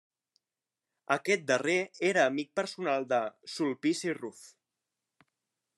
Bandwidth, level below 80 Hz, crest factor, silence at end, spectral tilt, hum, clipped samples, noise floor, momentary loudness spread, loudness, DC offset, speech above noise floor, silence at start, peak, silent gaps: 12.5 kHz; -88 dBFS; 24 dB; 1.3 s; -4 dB/octave; none; under 0.1%; under -90 dBFS; 8 LU; -30 LUFS; under 0.1%; over 60 dB; 1.1 s; -10 dBFS; none